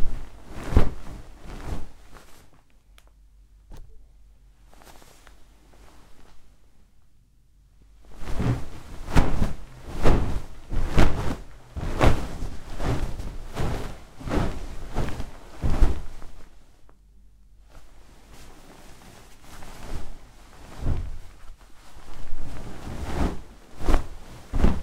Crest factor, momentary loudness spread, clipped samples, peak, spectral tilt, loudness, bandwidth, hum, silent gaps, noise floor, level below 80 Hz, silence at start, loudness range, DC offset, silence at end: 24 dB; 25 LU; under 0.1%; 0 dBFS; -6.5 dB/octave; -30 LUFS; 10.5 kHz; none; none; -56 dBFS; -30 dBFS; 0 s; 19 LU; under 0.1%; 0 s